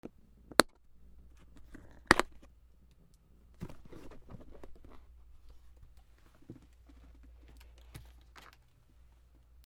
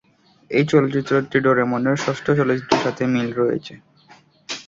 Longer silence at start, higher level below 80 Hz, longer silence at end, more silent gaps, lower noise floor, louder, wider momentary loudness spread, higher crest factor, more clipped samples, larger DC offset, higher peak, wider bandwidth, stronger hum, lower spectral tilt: second, 0.05 s vs 0.5 s; about the same, -56 dBFS vs -58 dBFS; first, 1.25 s vs 0.05 s; neither; first, -63 dBFS vs -51 dBFS; second, -29 LUFS vs -20 LUFS; first, 29 LU vs 5 LU; first, 40 dB vs 18 dB; neither; neither; about the same, 0 dBFS vs -2 dBFS; first, over 20 kHz vs 7.8 kHz; neither; second, -3 dB/octave vs -6 dB/octave